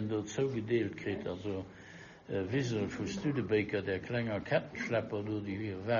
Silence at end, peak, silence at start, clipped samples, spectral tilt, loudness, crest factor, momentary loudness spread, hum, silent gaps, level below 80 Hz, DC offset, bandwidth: 0 s; -16 dBFS; 0 s; under 0.1%; -6 dB/octave; -35 LUFS; 18 dB; 8 LU; none; none; -64 dBFS; under 0.1%; 7.2 kHz